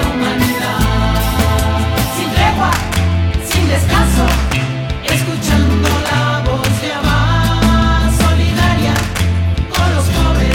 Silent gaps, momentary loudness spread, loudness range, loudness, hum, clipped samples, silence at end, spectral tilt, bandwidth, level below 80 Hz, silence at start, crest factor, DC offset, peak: none; 4 LU; 1 LU; -14 LUFS; none; under 0.1%; 0 s; -5 dB/octave; 18.5 kHz; -18 dBFS; 0 s; 12 dB; under 0.1%; -2 dBFS